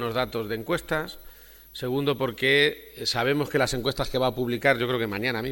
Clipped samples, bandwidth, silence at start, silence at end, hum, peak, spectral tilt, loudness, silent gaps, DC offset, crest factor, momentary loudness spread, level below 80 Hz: under 0.1%; 19 kHz; 0 s; 0 s; none; -6 dBFS; -4.5 dB/octave; -25 LUFS; none; under 0.1%; 20 dB; 9 LU; -48 dBFS